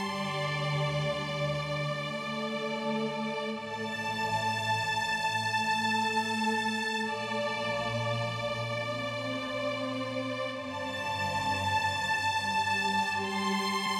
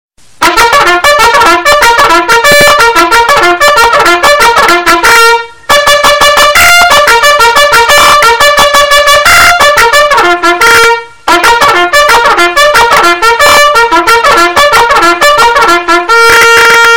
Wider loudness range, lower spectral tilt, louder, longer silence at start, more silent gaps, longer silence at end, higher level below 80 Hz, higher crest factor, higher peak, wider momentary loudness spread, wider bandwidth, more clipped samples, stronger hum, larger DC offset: first, 4 LU vs 1 LU; first, -4 dB/octave vs -1 dB/octave; second, -31 LUFS vs -3 LUFS; second, 0 s vs 0.2 s; neither; about the same, 0 s vs 0 s; second, -64 dBFS vs -30 dBFS; first, 14 dB vs 4 dB; second, -18 dBFS vs 0 dBFS; first, 6 LU vs 3 LU; second, 16.5 kHz vs over 20 kHz; second, under 0.1% vs 6%; neither; second, under 0.1% vs 3%